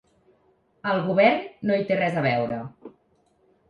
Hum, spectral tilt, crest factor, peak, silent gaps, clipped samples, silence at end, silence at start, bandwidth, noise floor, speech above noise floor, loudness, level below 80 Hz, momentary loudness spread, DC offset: none; -8 dB/octave; 22 dB; -4 dBFS; none; under 0.1%; 0.8 s; 0.85 s; 6.8 kHz; -65 dBFS; 42 dB; -23 LUFS; -64 dBFS; 13 LU; under 0.1%